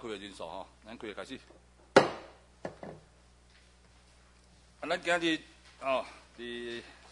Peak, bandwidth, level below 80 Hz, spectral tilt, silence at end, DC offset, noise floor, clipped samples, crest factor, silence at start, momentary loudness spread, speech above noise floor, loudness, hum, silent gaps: -6 dBFS; 11 kHz; -64 dBFS; -4 dB/octave; 0 s; under 0.1%; -61 dBFS; under 0.1%; 30 dB; 0 s; 23 LU; 24 dB; -33 LUFS; 60 Hz at -65 dBFS; none